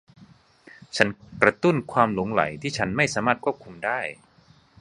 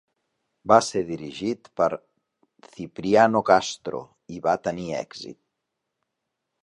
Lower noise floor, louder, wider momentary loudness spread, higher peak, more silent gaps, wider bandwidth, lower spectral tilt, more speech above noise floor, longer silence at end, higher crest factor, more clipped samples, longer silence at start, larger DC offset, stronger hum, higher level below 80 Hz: second, -57 dBFS vs -81 dBFS; about the same, -24 LUFS vs -23 LUFS; second, 9 LU vs 20 LU; about the same, 0 dBFS vs -2 dBFS; neither; about the same, 11.5 kHz vs 11.5 kHz; about the same, -5 dB/octave vs -4.5 dB/octave; second, 33 dB vs 58 dB; second, 0.65 s vs 1.3 s; about the same, 24 dB vs 24 dB; neither; second, 0.2 s vs 0.65 s; neither; neither; first, -56 dBFS vs -62 dBFS